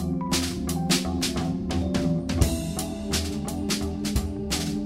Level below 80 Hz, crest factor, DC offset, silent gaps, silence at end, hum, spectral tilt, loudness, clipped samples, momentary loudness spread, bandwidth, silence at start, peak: -34 dBFS; 22 dB; under 0.1%; none; 0 s; none; -4.5 dB/octave; -27 LUFS; under 0.1%; 5 LU; 16 kHz; 0 s; -6 dBFS